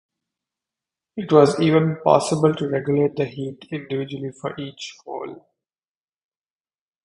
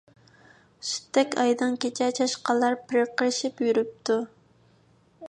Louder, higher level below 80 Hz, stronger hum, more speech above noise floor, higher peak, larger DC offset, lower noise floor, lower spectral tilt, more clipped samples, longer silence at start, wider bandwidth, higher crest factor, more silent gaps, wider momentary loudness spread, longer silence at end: first, -20 LUFS vs -26 LUFS; first, -62 dBFS vs -76 dBFS; neither; first, over 70 dB vs 36 dB; first, 0 dBFS vs -8 dBFS; neither; first, under -90 dBFS vs -61 dBFS; first, -6.5 dB/octave vs -2.5 dB/octave; neither; first, 1.15 s vs 0.8 s; about the same, 11 kHz vs 10.5 kHz; about the same, 22 dB vs 18 dB; neither; first, 17 LU vs 6 LU; first, 1.7 s vs 0 s